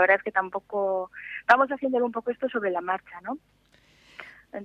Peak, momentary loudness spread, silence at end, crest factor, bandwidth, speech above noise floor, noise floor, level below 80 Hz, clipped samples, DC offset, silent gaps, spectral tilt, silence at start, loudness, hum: -4 dBFS; 19 LU; 0 s; 24 dB; 8.2 kHz; 33 dB; -59 dBFS; -68 dBFS; under 0.1%; under 0.1%; none; -5.5 dB/octave; 0 s; -26 LUFS; none